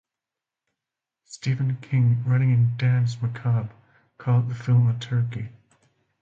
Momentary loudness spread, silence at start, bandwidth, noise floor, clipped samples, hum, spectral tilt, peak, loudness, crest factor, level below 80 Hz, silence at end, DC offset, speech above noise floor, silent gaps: 12 LU; 1.3 s; 7.6 kHz; -88 dBFS; under 0.1%; none; -7.5 dB/octave; -10 dBFS; -23 LUFS; 14 dB; -58 dBFS; 0.7 s; under 0.1%; 66 dB; none